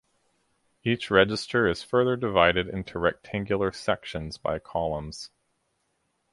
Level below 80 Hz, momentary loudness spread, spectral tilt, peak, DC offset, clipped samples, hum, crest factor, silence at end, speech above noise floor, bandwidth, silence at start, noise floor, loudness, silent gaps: -50 dBFS; 12 LU; -5.5 dB/octave; -4 dBFS; under 0.1%; under 0.1%; none; 22 dB; 1.05 s; 48 dB; 11.5 kHz; 0.85 s; -74 dBFS; -26 LUFS; none